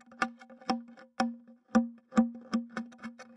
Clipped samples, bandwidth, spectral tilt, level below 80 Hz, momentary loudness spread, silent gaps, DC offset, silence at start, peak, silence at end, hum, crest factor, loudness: under 0.1%; 11 kHz; -5.5 dB/octave; -70 dBFS; 15 LU; none; under 0.1%; 0.1 s; -12 dBFS; 0.15 s; none; 22 dB; -34 LUFS